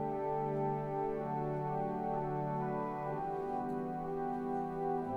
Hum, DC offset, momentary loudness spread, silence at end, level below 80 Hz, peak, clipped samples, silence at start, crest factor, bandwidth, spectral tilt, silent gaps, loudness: none; under 0.1%; 3 LU; 0 s; -62 dBFS; -24 dBFS; under 0.1%; 0 s; 12 dB; 7.4 kHz; -10 dB/octave; none; -37 LUFS